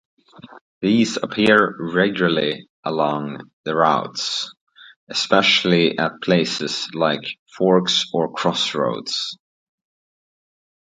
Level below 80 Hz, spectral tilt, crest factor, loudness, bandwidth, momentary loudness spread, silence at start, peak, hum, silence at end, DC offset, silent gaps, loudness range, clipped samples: -62 dBFS; -4.5 dB/octave; 20 dB; -19 LUFS; 10 kHz; 11 LU; 0.35 s; 0 dBFS; none; 1.45 s; under 0.1%; 0.61-0.81 s, 2.69-2.83 s, 3.53-3.64 s, 4.61-4.67 s, 4.96-5.07 s, 7.39-7.46 s; 3 LU; under 0.1%